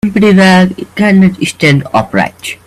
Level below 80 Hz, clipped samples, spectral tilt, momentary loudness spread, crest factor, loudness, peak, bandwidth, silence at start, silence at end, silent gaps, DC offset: -42 dBFS; 0.1%; -6 dB/octave; 8 LU; 8 dB; -9 LUFS; 0 dBFS; 13 kHz; 0.05 s; 0.1 s; none; under 0.1%